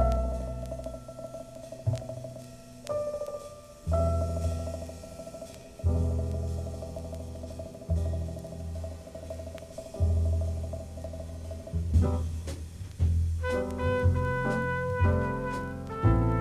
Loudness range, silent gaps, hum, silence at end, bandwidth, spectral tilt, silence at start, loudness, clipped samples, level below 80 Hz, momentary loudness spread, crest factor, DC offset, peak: 7 LU; none; none; 0 s; 12.5 kHz; -7.5 dB/octave; 0 s; -32 LUFS; under 0.1%; -38 dBFS; 15 LU; 18 dB; under 0.1%; -12 dBFS